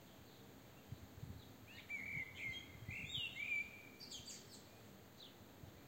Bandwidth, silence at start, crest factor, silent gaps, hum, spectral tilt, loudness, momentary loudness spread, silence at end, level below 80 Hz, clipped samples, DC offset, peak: 16 kHz; 0 s; 18 dB; none; none; -2.5 dB/octave; -48 LUFS; 18 LU; 0 s; -70 dBFS; under 0.1%; under 0.1%; -32 dBFS